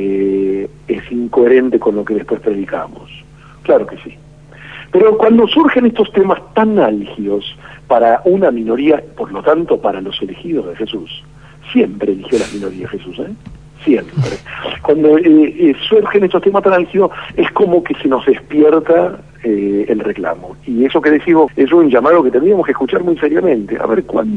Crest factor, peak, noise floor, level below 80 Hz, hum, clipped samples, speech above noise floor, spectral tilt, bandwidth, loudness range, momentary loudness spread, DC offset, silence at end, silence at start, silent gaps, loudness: 12 dB; 0 dBFS; -35 dBFS; -46 dBFS; none; under 0.1%; 23 dB; -7 dB/octave; 9.6 kHz; 6 LU; 14 LU; 0.3%; 0 s; 0 s; none; -13 LUFS